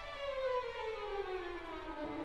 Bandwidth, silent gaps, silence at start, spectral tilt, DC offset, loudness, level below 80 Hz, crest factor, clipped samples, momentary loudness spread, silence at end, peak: 11.5 kHz; none; 0 s; -5 dB/octave; under 0.1%; -41 LUFS; -56 dBFS; 14 dB; under 0.1%; 7 LU; 0 s; -26 dBFS